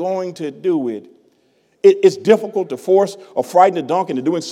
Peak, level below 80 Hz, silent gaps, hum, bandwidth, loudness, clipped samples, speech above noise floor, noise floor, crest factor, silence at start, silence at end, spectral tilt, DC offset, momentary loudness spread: 0 dBFS; -72 dBFS; none; none; 13 kHz; -16 LUFS; under 0.1%; 43 dB; -59 dBFS; 16 dB; 0 s; 0 s; -6 dB/octave; under 0.1%; 11 LU